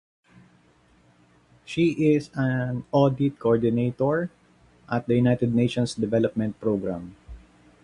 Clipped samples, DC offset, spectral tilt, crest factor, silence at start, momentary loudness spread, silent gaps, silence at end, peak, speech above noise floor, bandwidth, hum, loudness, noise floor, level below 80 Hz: under 0.1%; under 0.1%; -7.5 dB/octave; 18 dB; 1.7 s; 9 LU; none; 0.45 s; -6 dBFS; 36 dB; 11 kHz; none; -24 LUFS; -59 dBFS; -54 dBFS